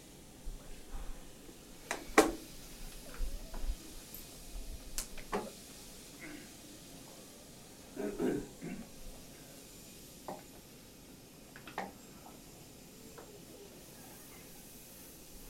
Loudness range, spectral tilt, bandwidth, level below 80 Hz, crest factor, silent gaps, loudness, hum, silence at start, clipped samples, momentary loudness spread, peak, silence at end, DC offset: 13 LU; -3.5 dB/octave; 16 kHz; -50 dBFS; 34 dB; none; -43 LUFS; none; 0 s; under 0.1%; 16 LU; -8 dBFS; 0 s; under 0.1%